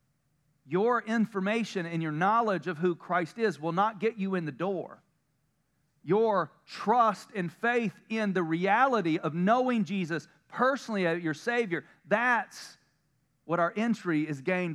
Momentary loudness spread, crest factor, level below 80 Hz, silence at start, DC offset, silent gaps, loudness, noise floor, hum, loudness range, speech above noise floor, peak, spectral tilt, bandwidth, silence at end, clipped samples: 9 LU; 18 dB; -84 dBFS; 0.7 s; under 0.1%; none; -29 LUFS; -75 dBFS; none; 4 LU; 46 dB; -10 dBFS; -6.5 dB/octave; 12.5 kHz; 0 s; under 0.1%